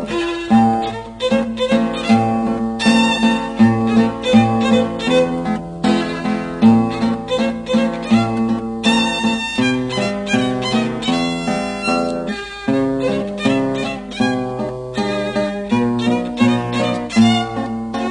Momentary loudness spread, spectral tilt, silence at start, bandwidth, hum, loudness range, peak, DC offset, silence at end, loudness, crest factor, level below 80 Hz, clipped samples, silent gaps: 8 LU; -5.5 dB/octave; 0 s; 10.5 kHz; none; 4 LU; 0 dBFS; under 0.1%; 0 s; -17 LUFS; 16 dB; -44 dBFS; under 0.1%; none